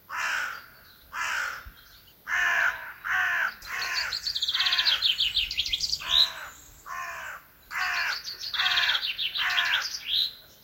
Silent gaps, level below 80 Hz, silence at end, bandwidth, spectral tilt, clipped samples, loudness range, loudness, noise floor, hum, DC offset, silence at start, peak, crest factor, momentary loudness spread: none; -56 dBFS; 0.15 s; 16 kHz; 1.5 dB/octave; under 0.1%; 4 LU; -26 LUFS; -53 dBFS; none; under 0.1%; 0.1 s; -10 dBFS; 20 dB; 17 LU